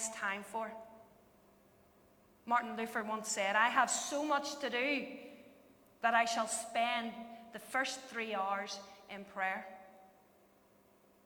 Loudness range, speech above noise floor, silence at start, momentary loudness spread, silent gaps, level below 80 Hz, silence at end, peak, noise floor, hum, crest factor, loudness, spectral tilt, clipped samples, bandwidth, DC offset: 6 LU; 31 dB; 0 s; 19 LU; none; -80 dBFS; 1.2 s; -16 dBFS; -67 dBFS; none; 22 dB; -36 LUFS; -1.5 dB/octave; under 0.1%; over 20 kHz; under 0.1%